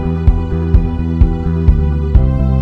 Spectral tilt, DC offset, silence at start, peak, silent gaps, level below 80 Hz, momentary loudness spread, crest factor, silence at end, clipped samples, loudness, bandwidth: -10.5 dB/octave; under 0.1%; 0 s; 0 dBFS; none; -14 dBFS; 2 LU; 12 dB; 0 s; 1%; -14 LUFS; 4.7 kHz